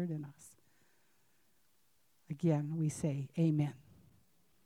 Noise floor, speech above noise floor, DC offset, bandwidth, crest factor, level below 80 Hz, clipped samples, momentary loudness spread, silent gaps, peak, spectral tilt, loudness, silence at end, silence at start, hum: -76 dBFS; 41 dB; under 0.1%; 12.5 kHz; 18 dB; -76 dBFS; under 0.1%; 12 LU; none; -20 dBFS; -8 dB/octave; -36 LUFS; 0.9 s; 0 s; none